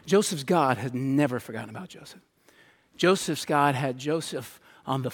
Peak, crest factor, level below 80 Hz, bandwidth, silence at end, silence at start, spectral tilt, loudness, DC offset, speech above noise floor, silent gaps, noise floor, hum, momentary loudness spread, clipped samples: -8 dBFS; 20 dB; -70 dBFS; 18 kHz; 0 s; 0.05 s; -5 dB/octave; -26 LUFS; under 0.1%; 33 dB; none; -59 dBFS; none; 18 LU; under 0.1%